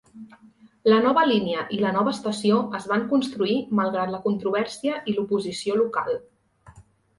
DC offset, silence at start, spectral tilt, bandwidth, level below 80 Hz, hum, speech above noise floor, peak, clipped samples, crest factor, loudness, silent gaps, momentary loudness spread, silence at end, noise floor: under 0.1%; 0.15 s; -5.5 dB/octave; 11.5 kHz; -64 dBFS; none; 28 dB; -6 dBFS; under 0.1%; 18 dB; -24 LUFS; none; 8 LU; 0.4 s; -51 dBFS